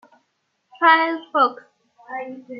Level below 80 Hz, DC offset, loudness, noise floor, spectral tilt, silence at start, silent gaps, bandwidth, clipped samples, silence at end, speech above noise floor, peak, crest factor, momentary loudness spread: -88 dBFS; under 0.1%; -18 LUFS; -71 dBFS; -4.5 dB/octave; 0.8 s; none; 5.4 kHz; under 0.1%; 0 s; 52 dB; -2 dBFS; 20 dB; 17 LU